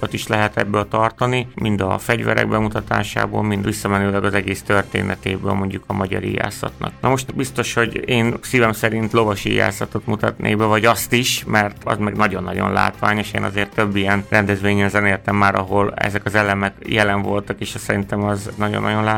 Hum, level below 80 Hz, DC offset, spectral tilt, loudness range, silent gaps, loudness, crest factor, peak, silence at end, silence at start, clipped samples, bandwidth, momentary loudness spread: none; -42 dBFS; under 0.1%; -5 dB/octave; 3 LU; none; -19 LUFS; 18 dB; -2 dBFS; 0 s; 0 s; under 0.1%; 18 kHz; 6 LU